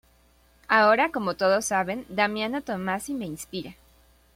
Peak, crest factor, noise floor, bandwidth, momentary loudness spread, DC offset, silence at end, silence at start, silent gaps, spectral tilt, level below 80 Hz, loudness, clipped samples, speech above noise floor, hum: -4 dBFS; 22 dB; -60 dBFS; 16.5 kHz; 15 LU; under 0.1%; 0.65 s; 0.7 s; none; -4 dB/octave; -60 dBFS; -25 LUFS; under 0.1%; 35 dB; none